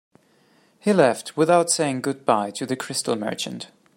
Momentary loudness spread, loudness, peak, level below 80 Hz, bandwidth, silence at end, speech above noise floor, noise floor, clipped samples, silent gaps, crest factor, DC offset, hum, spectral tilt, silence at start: 10 LU; -22 LUFS; -4 dBFS; -70 dBFS; 16.5 kHz; 0.3 s; 38 dB; -59 dBFS; under 0.1%; none; 20 dB; under 0.1%; none; -4 dB/octave; 0.85 s